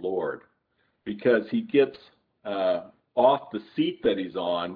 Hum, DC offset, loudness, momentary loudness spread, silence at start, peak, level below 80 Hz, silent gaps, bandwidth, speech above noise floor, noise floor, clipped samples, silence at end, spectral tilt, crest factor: none; under 0.1%; -26 LUFS; 13 LU; 0 s; -8 dBFS; -68 dBFS; none; 5 kHz; 47 dB; -72 dBFS; under 0.1%; 0 s; -9 dB/octave; 18 dB